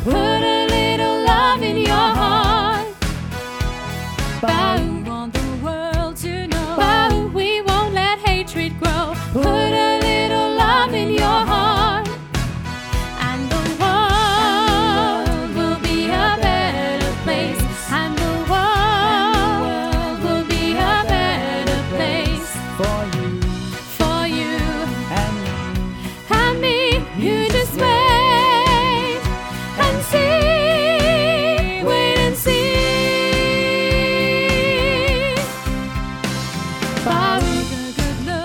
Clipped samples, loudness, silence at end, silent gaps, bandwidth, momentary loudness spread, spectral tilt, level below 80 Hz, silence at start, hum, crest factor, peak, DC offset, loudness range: under 0.1%; -18 LUFS; 0 s; none; 19.5 kHz; 9 LU; -4.5 dB/octave; -28 dBFS; 0 s; none; 16 dB; -2 dBFS; under 0.1%; 5 LU